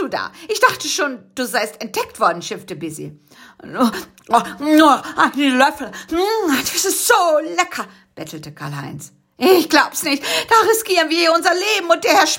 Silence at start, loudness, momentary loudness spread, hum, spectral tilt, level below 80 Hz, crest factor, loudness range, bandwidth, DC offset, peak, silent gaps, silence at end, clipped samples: 0 s; -16 LUFS; 17 LU; none; -2.5 dB/octave; -58 dBFS; 18 dB; 6 LU; 17 kHz; under 0.1%; 0 dBFS; none; 0 s; under 0.1%